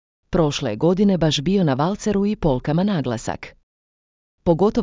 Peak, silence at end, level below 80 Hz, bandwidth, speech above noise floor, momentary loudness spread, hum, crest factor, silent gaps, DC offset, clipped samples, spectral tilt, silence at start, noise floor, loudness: -4 dBFS; 0 s; -40 dBFS; 7.6 kHz; over 71 dB; 9 LU; none; 16 dB; 3.63-4.38 s; under 0.1%; under 0.1%; -6.5 dB/octave; 0.3 s; under -90 dBFS; -20 LUFS